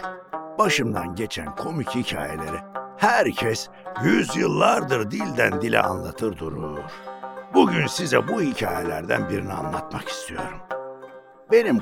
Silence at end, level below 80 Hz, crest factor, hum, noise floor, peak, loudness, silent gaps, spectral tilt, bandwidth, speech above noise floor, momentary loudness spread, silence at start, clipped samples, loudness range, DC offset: 0 s; -52 dBFS; 22 dB; none; -44 dBFS; -2 dBFS; -23 LUFS; none; -5 dB/octave; 17 kHz; 21 dB; 14 LU; 0 s; under 0.1%; 4 LU; under 0.1%